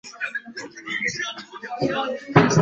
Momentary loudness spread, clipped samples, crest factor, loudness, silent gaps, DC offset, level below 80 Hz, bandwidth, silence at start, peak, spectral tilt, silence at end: 16 LU; under 0.1%; 22 dB; -24 LUFS; none; under 0.1%; -54 dBFS; 8.2 kHz; 0.05 s; -2 dBFS; -5 dB/octave; 0 s